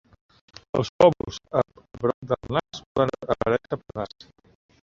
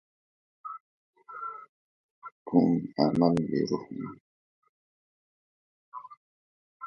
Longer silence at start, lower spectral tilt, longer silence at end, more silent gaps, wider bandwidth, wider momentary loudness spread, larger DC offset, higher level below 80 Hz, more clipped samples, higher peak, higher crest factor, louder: about the same, 0.75 s vs 0.65 s; second, -6.5 dB/octave vs -8 dB/octave; first, 0.8 s vs 0 s; second, 0.89-0.99 s, 2.14-2.22 s, 2.86-2.95 s vs 0.80-1.13 s, 1.69-2.22 s, 2.32-2.46 s, 4.20-4.62 s, 4.69-5.92 s, 6.17-6.80 s; about the same, 7.6 kHz vs 7 kHz; second, 14 LU vs 22 LU; neither; first, -52 dBFS vs -66 dBFS; neither; first, -2 dBFS vs -10 dBFS; about the same, 24 dB vs 22 dB; first, -25 LUFS vs -28 LUFS